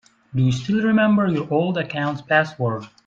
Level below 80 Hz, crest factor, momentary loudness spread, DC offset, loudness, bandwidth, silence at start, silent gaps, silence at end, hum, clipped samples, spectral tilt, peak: -56 dBFS; 18 dB; 9 LU; under 0.1%; -20 LUFS; 7.8 kHz; 0.35 s; none; 0.2 s; none; under 0.1%; -7 dB/octave; -4 dBFS